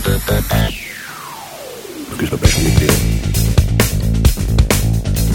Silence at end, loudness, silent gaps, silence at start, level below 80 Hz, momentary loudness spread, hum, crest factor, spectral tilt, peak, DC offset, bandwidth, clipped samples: 0 s; -15 LUFS; none; 0 s; -20 dBFS; 16 LU; none; 14 dB; -5 dB/octave; 0 dBFS; under 0.1%; 18.5 kHz; under 0.1%